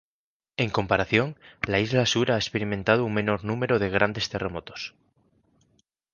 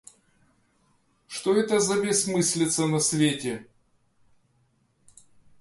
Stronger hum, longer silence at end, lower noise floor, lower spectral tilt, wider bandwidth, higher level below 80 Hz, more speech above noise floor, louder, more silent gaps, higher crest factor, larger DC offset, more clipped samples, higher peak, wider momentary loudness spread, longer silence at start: neither; second, 1.25 s vs 2 s; first, under -90 dBFS vs -68 dBFS; about the same, -5 dB/octave vs -4 dB/octave; second, 9.8 kHz vs 12 kHz; first, -52 dBFS vs -66 dBFS; first, over 65 dB vs 43 dB; about the same, -25 LUFS vs -24 LUFS; neither; about the same, 22 dB vs 18 dB; neither; neither; first, -4 dBFS vs -10 dBFS; about the same, 11 LU vs 10 LU; second, 0.6 s vs 1.3 s